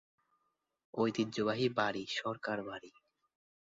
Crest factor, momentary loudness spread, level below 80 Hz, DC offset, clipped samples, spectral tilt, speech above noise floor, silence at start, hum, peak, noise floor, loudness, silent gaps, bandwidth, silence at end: 22 dB; 12 LU; -76 dBFS; under 0.1%; under 0.1%; -3.5 dB/octave; 46 dB; 0.95 s; none; -16 dBFS; -82 dBFS; -36 LUFS; none; 7.6 kHz; 0.8 s